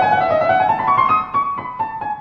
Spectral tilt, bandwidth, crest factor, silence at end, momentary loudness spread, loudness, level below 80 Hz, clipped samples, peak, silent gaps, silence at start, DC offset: -7 dB/octave; 6.6 kHz; 14 dB; 0 s; 9 LU; -17 LUFS; -50 dBFS; under 0.1%; -2 dBFS; none; 0 s; under 0.1%